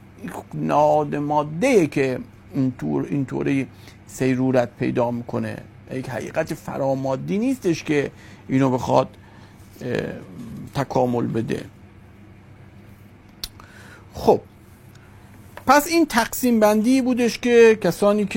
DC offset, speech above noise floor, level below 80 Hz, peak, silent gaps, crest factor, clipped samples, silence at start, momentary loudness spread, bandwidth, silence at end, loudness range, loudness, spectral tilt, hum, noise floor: under 0.1%; 26 dB; -52 dBFS; 0 dBFS; none; 22 dB; under 0.1%; 0.2 s; 16 LU; 16.5 kHz; 0 s; 9 LU; -21 LUFS; -6 dB/octave; none; -46 dBFS